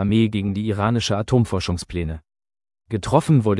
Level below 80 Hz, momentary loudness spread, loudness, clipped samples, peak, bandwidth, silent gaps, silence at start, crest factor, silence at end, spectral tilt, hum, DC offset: -42 dBFS; 11 LU; -21 LUFS; under 0.1%; -2 dBFS; 12 kHz; none; 0 s; 20 dB; 0 s; -6.5 dB/octave; none; under 0.1%